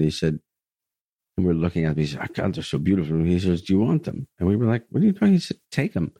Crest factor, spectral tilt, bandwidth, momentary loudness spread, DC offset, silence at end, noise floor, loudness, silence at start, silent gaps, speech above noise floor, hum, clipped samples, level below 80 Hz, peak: 16 dB; -7.5 dB/octave; 10.5 kHz; 7 LU; under 0.1%; 0.1 s; under -90 dBFS; -23 LUFS; 0 s; 1.01-1.19 s; over 68 dB; none; under 0.1%; -46 dBFS; -6 dBFS